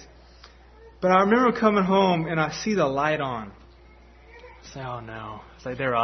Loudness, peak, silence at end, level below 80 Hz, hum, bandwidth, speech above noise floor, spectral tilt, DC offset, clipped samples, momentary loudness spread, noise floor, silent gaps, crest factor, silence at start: -22 LUFS; -6 dBFS; 0 s; -52 dBFS; none; 6.4 kHz; 28 dB; -6 dB/octave; under 0.1%; under 0.1%; 18 LU; -51 dBFS; none; 20 dB; 0 s